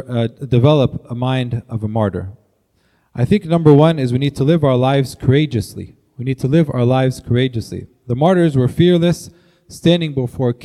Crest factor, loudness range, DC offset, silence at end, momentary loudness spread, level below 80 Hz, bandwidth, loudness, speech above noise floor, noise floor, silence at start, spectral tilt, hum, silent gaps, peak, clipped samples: 16 dB; 3 LU; under 0.1%; 0 s; 13 LU; -46 dBFS; 13 kHz; -16 LUFS; 45 dB; -60 dBFS; 0.1 s; -7.5 dB/octave; none; none; 0 dBFS; under 0.1%